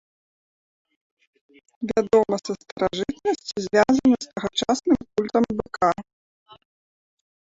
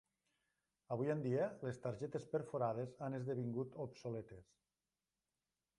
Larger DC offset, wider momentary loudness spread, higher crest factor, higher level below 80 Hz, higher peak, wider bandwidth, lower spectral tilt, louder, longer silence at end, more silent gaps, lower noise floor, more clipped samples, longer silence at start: neither; about the same, 8 LU vs 8 LU; about the same, 20 dB vs 18 dB; first, -56 dBFS vs -78 dBFS; first, -4 dBFS vs -26 dBFS; second, 8 kHz vs 11 kHz; second, -5 dB/octave vs -8.5 dB/octave; first, -23 LUFS vs -43 LUFS; first, 1.55 s vs 1.35 s; first, 2.72-2.76 s vs none; about the same, under -90 dBFS vs under -90 dBFS; neither; first, 1.8 s vs 0.9 s